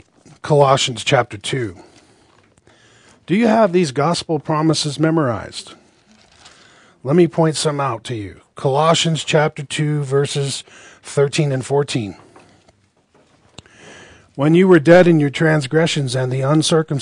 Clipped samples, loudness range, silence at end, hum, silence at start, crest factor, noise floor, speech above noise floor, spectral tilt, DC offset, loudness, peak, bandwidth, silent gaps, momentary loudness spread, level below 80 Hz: under 0.1%; 7 LU; 0 s; none; 0.45 s; 18 dB; -57 dBFS; 41 dB; -5.5 dB/octave; under 0.1%; -16 LUFS; 0 dBFS; 10.5 kHz; none; 13 LU; -58 dBFS